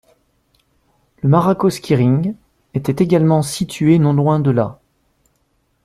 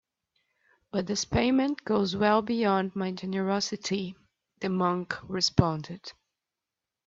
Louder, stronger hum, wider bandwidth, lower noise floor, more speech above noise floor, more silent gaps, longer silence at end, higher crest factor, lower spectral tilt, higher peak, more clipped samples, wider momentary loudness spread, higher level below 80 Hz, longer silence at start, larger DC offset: first, -16 LUFS vs -28 LUFS; neither; first, 14.5 kHz vs 7.8 kHz; second, -64 dBFS vs -89 dBFS; second, 49 dB vs 61 dB; neither; first, 1.1 s vs 0.95 s; second, 16 dB vs 26 dB; first, -7.5 dB/octave vs -5 dB/octave; about the same, -2 dBFS vs -4 dBFS; neither; about the same, 10 LU vs 11 LU; about the same, -52 dBFS vs -54 dBFS; first, 1.25 s vs 0.95 s; neither